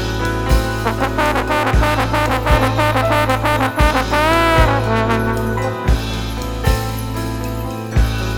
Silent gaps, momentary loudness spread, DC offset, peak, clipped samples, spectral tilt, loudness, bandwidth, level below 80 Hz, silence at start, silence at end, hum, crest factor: none; 9 LU; under 0.1%; 0 dBFS; under 0.1%; -5.5 dB/octave; -17 LUFS; 19 kHz; -22 dBFS; 0 s; 0 s; none; 16 dB